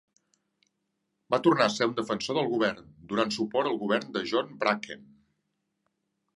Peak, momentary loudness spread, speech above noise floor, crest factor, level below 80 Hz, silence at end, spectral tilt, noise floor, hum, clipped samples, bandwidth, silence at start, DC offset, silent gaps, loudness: -8 dBFS; 9 LU; 52 dB; 22 dB; -70 dBFS; 1.35 s; -4.5 dB/octave; -80 dBFS; none; under 0.1%; 11.5 kHz; 1.3 s; under 0.1%; none; -28 LUFS